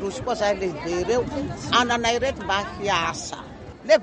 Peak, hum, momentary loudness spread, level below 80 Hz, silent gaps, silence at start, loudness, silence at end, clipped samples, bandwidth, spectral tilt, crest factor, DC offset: -6 dBFS; none; 12 LU; -46 dBFS; none; 0 s; -24 LUFS; 0 s; under 0.1%; 10 kHz; -3.5 dB/octave; 18 dB; under 0.1%